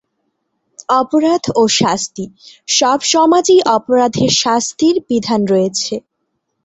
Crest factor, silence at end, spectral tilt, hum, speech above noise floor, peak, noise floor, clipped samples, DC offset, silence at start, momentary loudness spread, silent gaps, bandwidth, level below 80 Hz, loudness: 14 dB; 0.65 s; -3.5 dB/octave; none; 57 dB; 0 dBFS; -70 dBFS; under 0.1%; under 0.1%; 0.9 s; 12 LU; none; 8.4 kHz; -54 dBFS; -13 LUFS